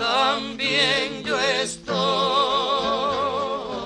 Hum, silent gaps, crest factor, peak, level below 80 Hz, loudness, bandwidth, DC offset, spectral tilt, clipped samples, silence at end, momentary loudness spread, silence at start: none; none; 16 dB; -6 dBFS; -54 dBFS; -22 LUFS; 11.5 kHz; under 0.1%; -3 dB/octave; under 0.1%; 0 s; 5 LU; 0 s